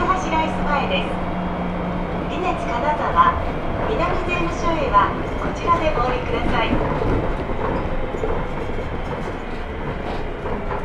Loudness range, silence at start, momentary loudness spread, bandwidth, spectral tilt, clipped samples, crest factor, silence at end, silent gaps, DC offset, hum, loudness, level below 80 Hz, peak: 5 LU; 0 s; 10 LU; 9.2 kHz; -6.5 dB/octave; under 0.1%; 18 dB; 0 s; none; under 0.1%; none; -22 LUFS; -28 dBFS; -2 dBFS